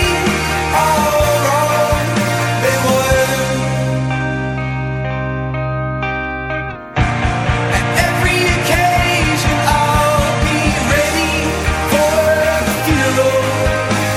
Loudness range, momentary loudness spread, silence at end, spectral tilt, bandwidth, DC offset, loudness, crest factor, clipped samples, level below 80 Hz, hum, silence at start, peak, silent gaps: 5 LU; 7 LU; 0 s; -4.5 dB/octave; 17 kHz; under 0.1%; -15 LUFS; 12 dB; under 0.1%; -26 dBFS; none; 0 s; -2 dBFS; none